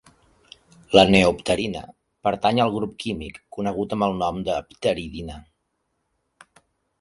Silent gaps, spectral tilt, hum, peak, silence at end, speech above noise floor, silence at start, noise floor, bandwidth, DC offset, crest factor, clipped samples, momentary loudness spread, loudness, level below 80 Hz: none; -5.5 dB/octave; none; 0 dBFS; 1.6 s; 52 dB; 0.9 s; -74 dBFS; 11.5 kHz; under 0.1%; 24 dB; under 0.1%; 18 LU; -22 LUFS; -48 dBFS